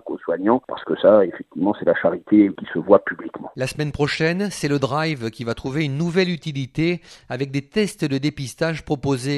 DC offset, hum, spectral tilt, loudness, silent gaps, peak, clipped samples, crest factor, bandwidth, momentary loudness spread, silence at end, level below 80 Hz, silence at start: under 0.1%; none; -6 dB/octave; -21 LUFS; none; 0 dBFS; under 0.1%; 20 dB; 12.5 kHz; 11 LU; 0 s; -50 dBFS; 0.05 s